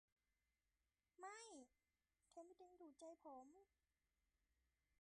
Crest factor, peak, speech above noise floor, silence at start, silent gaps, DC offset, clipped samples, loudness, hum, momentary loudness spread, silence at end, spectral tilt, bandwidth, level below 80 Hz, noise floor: 20 dB; -48 dBFS; over 26 dB; 1.2 s; none; under 0.1%; under 0.1%; -63 LUFS; none; 8 LU; 0.1 s; -2 dB/octave; 10 kHz; under -90 dBFS; under -90 dBFS